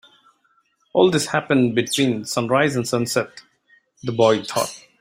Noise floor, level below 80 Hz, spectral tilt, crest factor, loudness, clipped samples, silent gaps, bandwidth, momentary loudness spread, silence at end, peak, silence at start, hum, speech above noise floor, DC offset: -64 dBFS; -60 dBFS; -4.5 dB/octave; 20 dB; -20 LUFS; under 0.1%; none; 16 kHz; 8 LU; 0.2 s; -2 dBFS; 0.95 s; none; 44 dB; under 0.1%